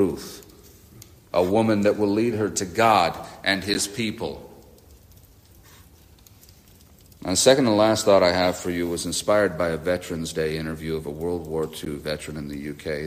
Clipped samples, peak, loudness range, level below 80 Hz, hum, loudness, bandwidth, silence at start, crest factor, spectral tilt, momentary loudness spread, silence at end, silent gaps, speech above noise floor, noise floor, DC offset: under 0.1%; -2 dBFS; 9 LU; -52 dBFS; none; -23 LUFS; 15.5 kHz; 0 s; 22 dB; -4 dB/octave; 15 LU; 0 s; none; 29 dB; -51 dBFS; under 0.1%